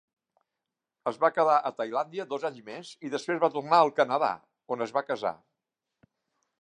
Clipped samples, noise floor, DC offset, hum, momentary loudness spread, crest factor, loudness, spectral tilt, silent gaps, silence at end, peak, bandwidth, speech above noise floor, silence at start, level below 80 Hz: under 0.1%; -87 dBFS; under 0.1%; none; 15 LU; 22 dB; -28 LUFS; -5 dB/octave; none; 1.25 s; -8 dBFS; 10.5 kHz; 60 dB; 1.05 s; -82 dBFS